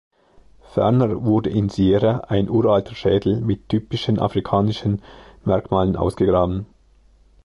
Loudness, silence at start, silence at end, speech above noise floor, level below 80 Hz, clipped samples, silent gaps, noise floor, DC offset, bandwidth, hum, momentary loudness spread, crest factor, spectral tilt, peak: -20 LUFS; 0.75 s; 0.8 s; 35 dB; -40 dBFS; under 0.1%; none; -53 dBFS; under 0.1%; 11.5 kHz; none; 7 LU; 16 dB; -8.5 dB/octave; -4 dBFS